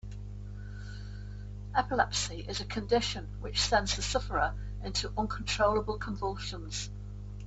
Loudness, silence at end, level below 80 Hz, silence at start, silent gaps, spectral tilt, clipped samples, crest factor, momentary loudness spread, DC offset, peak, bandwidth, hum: -32 LUFS; 0 s; -42 dBFS; 0.05 s; none; -3.5 dB/octave; under 0.1%; 22 dB; 16 LU; under 0.1%; -10 dBFS; 8.4 kHz; 50 Hz at -40 dBFS